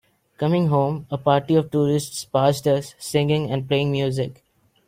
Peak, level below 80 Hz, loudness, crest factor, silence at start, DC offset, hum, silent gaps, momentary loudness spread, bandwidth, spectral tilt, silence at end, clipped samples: -4 dBFS; -56 dBFS; -22 LUFS; 18 dB; 0.4 s; under 0.1%; none; none; 6 LU; 16 kHz; -6.5 dB/octave; 0.55 s; under 0.1%